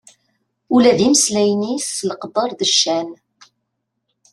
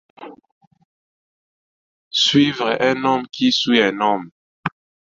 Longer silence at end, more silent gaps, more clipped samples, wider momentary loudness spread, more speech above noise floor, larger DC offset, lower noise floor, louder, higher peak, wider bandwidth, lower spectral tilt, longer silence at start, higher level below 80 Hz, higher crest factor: first, 1.2 s vs 0.45 s; second, none vs 0.52-0.61 s, 0.67-0.71 s, 0.85-2.11 s, 4.32-4.63 s; neither; second, 10 LU vs 15 LU; second, 58 dB vs over 73 dB; neither; second, -74 dBFS vs under -90 dBFS; about the same, -16 LUFS vs -17 LUFS; about the same, -2 dBFS vs -2 dBFS; first, 13 kHz vs 7.8 kHz; about the same, -3 dB/octave vs -4 dB/octave; first, 0.7 s vs 0.2 s; about the same, -60 dBFS vs -62 dBFS; about the same, 18 dB vs 18 dB